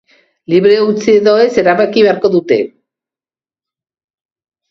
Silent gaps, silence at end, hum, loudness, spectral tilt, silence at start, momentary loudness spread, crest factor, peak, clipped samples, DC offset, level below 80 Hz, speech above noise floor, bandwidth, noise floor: none; 2.05 s; none; -11 LUFS; -6 dB/octave; 0.5 s; 6 LU; 12 dB; 0 dBFS; under 0.1%; under 0.1%; -56 dBFS; over 80 dB; 7.2 kHz; under -90 dBFS